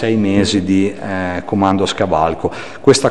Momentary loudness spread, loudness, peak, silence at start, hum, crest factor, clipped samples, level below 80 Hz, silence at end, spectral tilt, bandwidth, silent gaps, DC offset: 7 LU; -16 LUFS; 0 dBFS; 0 s; none; 14 dB; under 0.1%; -42 dBFS; 0 s; -5 dB/octave; 11.5 kHz; none; 2%